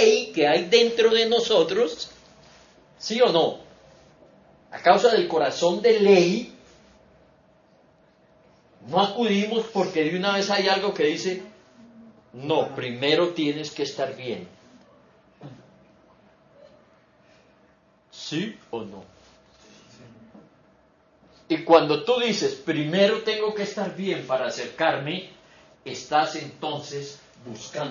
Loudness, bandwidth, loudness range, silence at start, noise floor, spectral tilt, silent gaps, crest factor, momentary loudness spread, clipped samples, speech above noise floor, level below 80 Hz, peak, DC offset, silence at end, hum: -23 LUFS; 7.4 kHz; 16 LU; 0 s; -60 dBFS; -4.5 dB/octave; none; 22 dB; 17 LU; under 0.1%; 37 dB; -70 dBFS; -2 dBFS; under 0.1%; 0 s; none